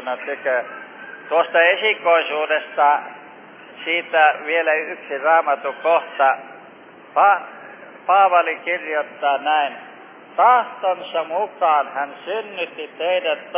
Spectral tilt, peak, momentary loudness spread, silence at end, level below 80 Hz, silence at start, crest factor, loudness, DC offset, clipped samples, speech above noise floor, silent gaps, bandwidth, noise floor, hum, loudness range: -5.5 dB/octave; -2 dBFS; 15 LU; 0 s; under -90 dBFS; 0 s; 18 dB; -19 LUFS; under 0.1%; under 0.1%; 24 dB; none; 3.7 kHz; -43 dBFS; none; 2 LU